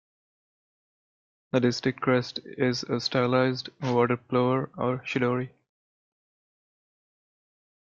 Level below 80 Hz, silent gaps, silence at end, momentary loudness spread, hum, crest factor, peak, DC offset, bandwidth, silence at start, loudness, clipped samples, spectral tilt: -68 dBFS; none; 2.5 s; 6 LU; none; 20 dB; -10 dBFS; under 0.1%; 7.4 kHz; 1.55 s; -27 LUFS; under 0.1%; -6 dB/octave